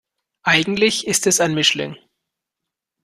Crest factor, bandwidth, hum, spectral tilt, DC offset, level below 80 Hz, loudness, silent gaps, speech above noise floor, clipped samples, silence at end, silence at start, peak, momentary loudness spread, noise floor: 20 dB; 14.5 kHz; none; -2.5 dB/octave; under 0.1%; -58 dBFS; -17 LUFS; none; 65 dB; under 0.1%; 1.1 s; 0.45 s; 0 dBFS; 10 LU; -83 dBFS